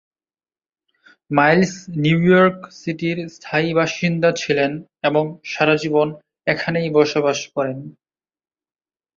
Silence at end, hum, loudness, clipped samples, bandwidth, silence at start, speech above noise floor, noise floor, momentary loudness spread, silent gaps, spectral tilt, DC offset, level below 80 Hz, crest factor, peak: 1.25 s; none; -19 LUFS; under 0.1%; 7.6 kHz; 1.3 s; over 72 dB; under -90 dBFS; 10 LU; none; -6 dB/octave; under 0.1%; -58 dBFS; 18 dB; -2 dBFS